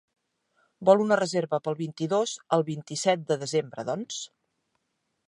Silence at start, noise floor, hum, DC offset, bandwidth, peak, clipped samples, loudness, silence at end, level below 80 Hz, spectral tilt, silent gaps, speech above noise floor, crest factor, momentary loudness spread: 0.8 s; -78 dBFS; none; under 0.1%; 11.5 kHz; -6 dBFS; under 0.1%; -27 LUFS; 1 s; -78 dBFS; -4.5 dB/octave; none; 52 dB; 22 dB; 11 LU